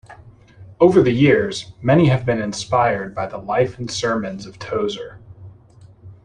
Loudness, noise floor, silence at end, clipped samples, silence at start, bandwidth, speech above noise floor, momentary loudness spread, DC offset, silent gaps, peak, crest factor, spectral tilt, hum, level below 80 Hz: -18 LUFS; -46 dBFS; 0.1 s; under 0.1%; 0.1 s; 10.5 kHz; 29 dB; 13 LU; under 0.1%; none; -2 dBFS; 18 dB; -6 dB/octave; none; -48 dBFS